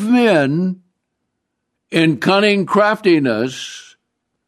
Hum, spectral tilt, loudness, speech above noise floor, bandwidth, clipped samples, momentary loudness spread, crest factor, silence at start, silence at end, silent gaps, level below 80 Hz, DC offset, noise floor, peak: none; -6 dB/octave; -15 LUFS; 60 dB; 13.5 kHz; under 0.1%; 16 LU; 14 dB; 0 s; 0.65 s; none; -64 dBFS; under 0.1%; -75 dBFS; -2 dBFS